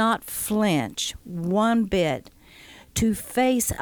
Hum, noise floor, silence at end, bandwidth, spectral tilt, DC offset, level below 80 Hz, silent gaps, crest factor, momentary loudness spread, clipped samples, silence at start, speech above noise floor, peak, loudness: none; -48 dBFS; 0 s; over 20 kHz; -4.5 dB/octave; under 0.1%; -46 dBFS; none; 14 dB; 8 LU; under 0.1%; 0 s; 25 dB; -10 dBFS; -24 LUFS